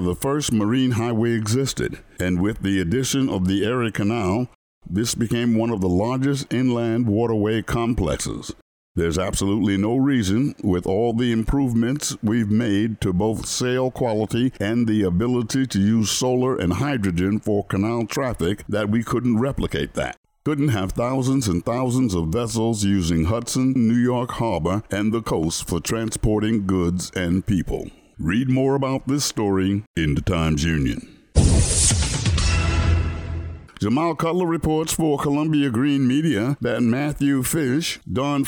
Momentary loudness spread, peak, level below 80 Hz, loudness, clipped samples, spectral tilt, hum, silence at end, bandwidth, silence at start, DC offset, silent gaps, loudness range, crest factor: 5 LU; -4 dBFS; -34 dBFS; -21 LUFS; under 0.1%; -5.5 dB/octave; none; 0 s; over 20 kHz; 0 s; under 0.1%; 4.55-4.81 s, 8.62-8.95 s, 20.17-20.24 s, 29.87-29.94 s; 2 LU; 16 dB